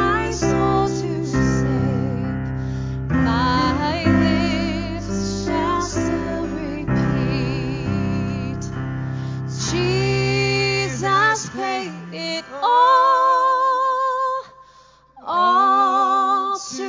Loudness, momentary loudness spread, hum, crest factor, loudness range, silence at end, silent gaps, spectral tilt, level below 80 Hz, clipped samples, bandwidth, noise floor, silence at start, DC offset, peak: -20 LUFS; 11 LU; none; 16 dB; 5 LU; 0 s; none; -5.5 dB/octave; -36 dBFS; under 0.1%; 7.6 kHz; -50 dBFS; 0 s; under 0.1%; -4 dBFS